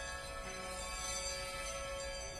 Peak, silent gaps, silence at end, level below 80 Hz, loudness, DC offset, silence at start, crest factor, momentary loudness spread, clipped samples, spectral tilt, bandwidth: -28 dBFS; none; 0 s; -52 dBFS; -41 LUFS; under 0.1%; 0 s; 14 dB; 5 LU; under 0.1%; -1.5 dB/octave; 14 kHz